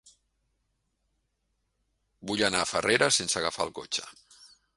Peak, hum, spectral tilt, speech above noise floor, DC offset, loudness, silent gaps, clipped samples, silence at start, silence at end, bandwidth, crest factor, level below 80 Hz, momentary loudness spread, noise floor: -6 dBFS; none; -2 dB/octave; 49 dB; under 0.1%; -27 LUFS; none; under 0.1%; 2.2 s; 0.3 s; 11.5 kHz; 26 dB; -62 dBFS; 11 LU; -77 dBFS